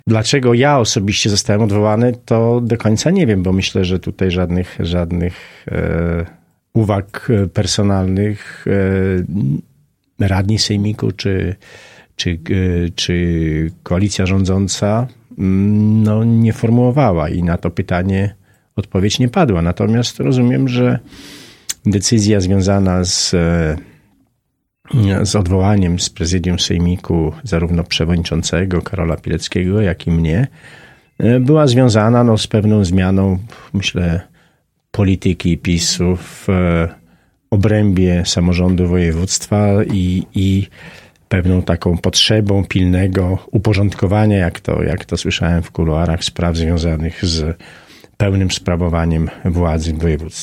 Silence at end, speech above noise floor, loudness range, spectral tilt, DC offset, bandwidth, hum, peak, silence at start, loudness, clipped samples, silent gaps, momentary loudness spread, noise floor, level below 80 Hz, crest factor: 0 s; 55 dB; 4 LU; -5.5 dB/octave; under 0.1%; 14 kHz; none; 0 dBFS; 0.05 s; -15 LUFS; under 0.1%; none; 7 LU; -69 dBFS; -32 dBFS; 14 dB